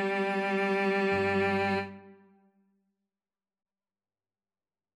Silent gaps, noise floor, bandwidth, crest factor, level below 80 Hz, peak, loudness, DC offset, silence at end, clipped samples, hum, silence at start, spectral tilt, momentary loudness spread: none; under -90 dBFS; 11 kHz; 16 dB; -76 dBFS; -16 dBFS; -28 LUFS; under 0.1%; 2.85 s; under 0.1%; none; 0 s; -6.5 dB/octave; 4 LU